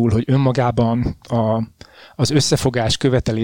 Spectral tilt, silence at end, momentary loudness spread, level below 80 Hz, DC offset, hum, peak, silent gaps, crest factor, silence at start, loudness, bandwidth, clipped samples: -5.5 dB/octave; 0 s; 6 LU; -38 dBFS; under 0.1%; none; -4 dBFS; none; 14 dB; 0 s; -18 LUFS; 17 kHz; under 0.1%